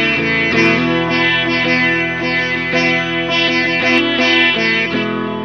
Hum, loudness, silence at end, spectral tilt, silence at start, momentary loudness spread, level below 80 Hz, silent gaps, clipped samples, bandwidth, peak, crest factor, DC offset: none; -13 LUFS; 0 s; -4.5 dB/octave; 0 s; 4 LU; -48 dBFS; none; under 0.1%; 7 kHz; 0 dBFS; 14 dB; 0.4%